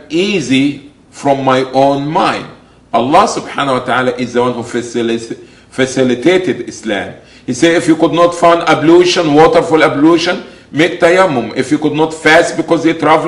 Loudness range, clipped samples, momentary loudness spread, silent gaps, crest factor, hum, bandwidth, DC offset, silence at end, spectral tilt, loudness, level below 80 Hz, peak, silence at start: 5 LU; 0.5%; 11 LU; none; 12 dB; none; 11.5 kHz; under 0.1%; 0 s; -5 dB/octave; -11 LUFS; -46 dBFS; 0 dBFS; 0.1 s